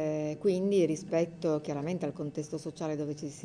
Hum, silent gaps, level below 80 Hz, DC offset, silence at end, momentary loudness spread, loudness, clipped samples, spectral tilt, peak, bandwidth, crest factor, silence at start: none; none; -70 dBFS; under 0.1%; 0 s; 10 LU; -32 LUFS; under 0.1%; -6.5 dB/octave; -16 dBFS; 10 kHz; 14 dB; 0 s